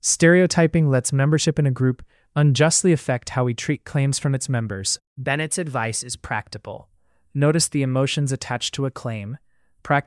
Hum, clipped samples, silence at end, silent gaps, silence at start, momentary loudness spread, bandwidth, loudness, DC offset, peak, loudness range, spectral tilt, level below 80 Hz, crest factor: none; under 0.1%; 0.05 s; 5.07-5.16 s; 0.05 s; 14 LU; 12 kHz; -21 LUFS; under 0.1%; -4 dBFS; 5 LU; -4.5 dB/octave; -52 dBFS; 16 dB